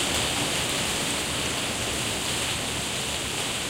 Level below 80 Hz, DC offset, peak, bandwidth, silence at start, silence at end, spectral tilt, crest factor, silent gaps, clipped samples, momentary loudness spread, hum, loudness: -44 dBFS; under 0.1%; -10 dBFS; 16 kHz; 0 s; 0 s; -2 dB/octave; 18 dB; none; under 0.1%; 3 LU; none; -25 LUFS